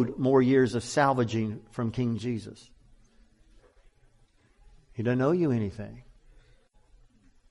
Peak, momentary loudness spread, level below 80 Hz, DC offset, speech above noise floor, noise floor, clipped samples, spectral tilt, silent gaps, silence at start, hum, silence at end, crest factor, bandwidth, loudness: -10 dBFS; 15 LU; -58 dBFS; under 0.1%; 36 dB; -63 dBFS; under 0.1%; -7 dB/octave; none; 0 s; none; 1.5 s; 20 dB; 11.5 kHz; -27 LUFS